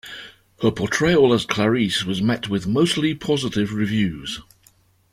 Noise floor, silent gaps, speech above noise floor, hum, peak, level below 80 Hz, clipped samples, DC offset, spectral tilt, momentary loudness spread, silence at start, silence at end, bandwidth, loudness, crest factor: -57 dBFS; none; 37 dB; none; -2 dBFS; -50 dBFS; under 0.1%; under 0.1%; -5 dB/octave; 13 LU; 0.05 s; 0.7 s; 15.5 kHz; -20 LUFS; 20 dB